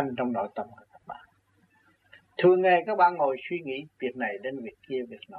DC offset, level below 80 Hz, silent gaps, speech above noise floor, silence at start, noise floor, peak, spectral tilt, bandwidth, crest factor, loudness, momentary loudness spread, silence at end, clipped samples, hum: under 0.1%; -74 dBFS; none; 39 dB; 0 s; -66 dBFS; -10 dBFS; -8.5 dB/octave; 4.6 kHz; 18 dB; -27 LUFS; 21 LU; 0 s; under 0.1%; none